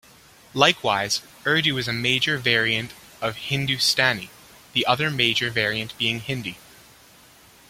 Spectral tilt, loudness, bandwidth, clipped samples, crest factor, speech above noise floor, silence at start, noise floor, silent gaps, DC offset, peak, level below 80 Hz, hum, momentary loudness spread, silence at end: -3 dB/octave; -22 LUFS; 16.5 kHz; under 0.1%; 24 dB; 28 dB; 0.55 s; -51 dBFS; none; under 0.1%; -2 dBFS; -58 dBFS; none; 11 LU; 1.1 s